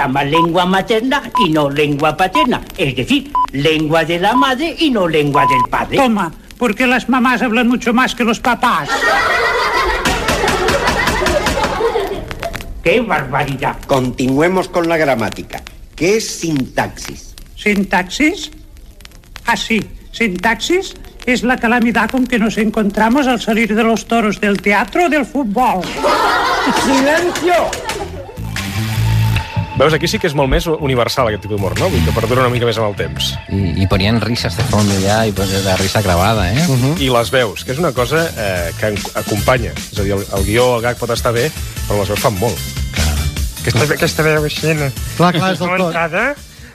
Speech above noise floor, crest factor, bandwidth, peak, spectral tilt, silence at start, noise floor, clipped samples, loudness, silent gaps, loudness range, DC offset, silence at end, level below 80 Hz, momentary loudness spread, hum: 23 dB; 14 dB; 15 kHz; 0 dBFS; -5 dB/octave; 0 s; -37 dBFS; under 0.1%; -15 LUFS; none; 3 LU; under 0.1%; 0 s; -30 dBFS; 7 LU; none